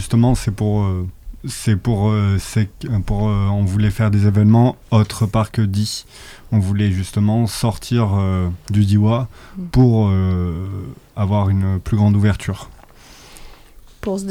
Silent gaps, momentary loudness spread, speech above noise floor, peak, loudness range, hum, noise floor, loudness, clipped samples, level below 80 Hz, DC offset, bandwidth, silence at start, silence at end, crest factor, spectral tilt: none; 13 LU; 26 dB; -4 dBFS; 3 LU; none; -43 dBFS; -18 LUFS; under 0.1%; -34 dBFS; under 0.1%; 14 kHz; 0 s; 0 s; 14 dB; -7 dB/octave